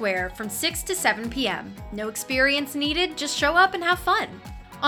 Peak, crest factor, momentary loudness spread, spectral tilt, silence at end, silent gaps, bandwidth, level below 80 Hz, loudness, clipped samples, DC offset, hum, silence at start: -6 dBFS; 20 dB; 13 LU; -2.5 dB/octave; 0 s; none; over 20 kHz; -44 dBFS; -23 LUFS; under 0.1%; under 0.1%; none; 0 s